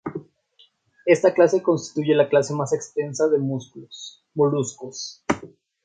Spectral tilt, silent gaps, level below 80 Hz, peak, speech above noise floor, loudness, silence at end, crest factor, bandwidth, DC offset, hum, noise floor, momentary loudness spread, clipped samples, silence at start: -5.5 dB/octave; none; -62 dBFS; -2 dBFS; 38 dB; -22 LUFS; 0.35 s; 20 dB; 9.4 kHz; under 0.1%; none; -59 dBFS; 17 LU; under 0.1%; 0.05 s